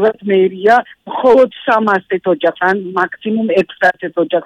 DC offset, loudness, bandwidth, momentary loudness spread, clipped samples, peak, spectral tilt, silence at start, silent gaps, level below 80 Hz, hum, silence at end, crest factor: under 0.1%; -14 LUFS; 9 kHz; 6 LU; under 0.1%; -2 dBFS; -6.5 dB/octave; 0 s; none; -56 dBFS; none; 0 s; 12 dB